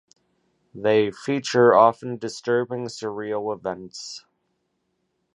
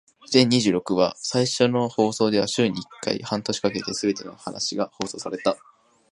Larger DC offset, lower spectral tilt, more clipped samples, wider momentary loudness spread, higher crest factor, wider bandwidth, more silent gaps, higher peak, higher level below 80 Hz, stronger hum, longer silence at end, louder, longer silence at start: neither; about the same, -5 dB/octave vs -4.5 dB/octave; neither; first, 18 LU vs 10 LU; about the same, 22 dB vs 22 dB; about the same, 10.5 kHz vs 11.5 kHz; neither; about the same, -2 dBFS vs -2 dBFS; second, -68 dBFS vs -62 dBFS; neither; first, 1.2 s vs 0.55 s; about the same, -22 LUFS vs -23 LUFS; first, 0.75 s vs 0.3 s